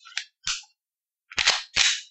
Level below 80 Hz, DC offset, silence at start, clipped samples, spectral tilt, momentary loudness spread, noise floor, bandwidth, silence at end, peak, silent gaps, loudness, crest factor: -56 dBFS; under 0.1%; 0.05 s; under 0.1%; 2.5 dB/octave; 11 LU; under -90 dBFS; 8.8 kHz; 0.05 s; -4 dBFS; none; -24 LUFS; 24 dB